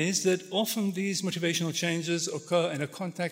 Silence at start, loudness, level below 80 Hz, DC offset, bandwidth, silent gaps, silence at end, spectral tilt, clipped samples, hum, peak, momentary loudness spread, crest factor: 0 s; -29 LUFS; -80 dBFS; under 0.1%; 16 kHz; none; 0 s; -4 dB/octave; under 0.1%; none; -12 dBFS; 4 LU; 16 dB